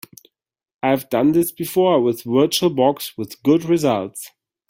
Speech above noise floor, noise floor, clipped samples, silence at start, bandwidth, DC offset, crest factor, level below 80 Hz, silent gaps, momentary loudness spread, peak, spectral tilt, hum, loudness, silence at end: 33 dB; -51 dBFS; under 0.1%; 0.85 s; 16.5 kHz; under 0.1%; 16 dB; -60 dBFS; none; 11 LU; -4 dBFS; -5.5 dB/octave; none; -18 LUFS; 0.4 s